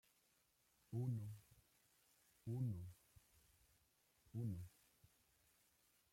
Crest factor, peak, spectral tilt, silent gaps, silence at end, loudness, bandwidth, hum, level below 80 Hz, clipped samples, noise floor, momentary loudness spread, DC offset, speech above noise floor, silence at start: 18 dB; -34 dBFS; -8.5 dB/octave; none; 1.45 s; -49 LUFS; 16.5 kHz; none; -80 dBFS; under 0.1%; -81 dBFS; 15 LU; under 0.1%; 35 dB; 0.9 s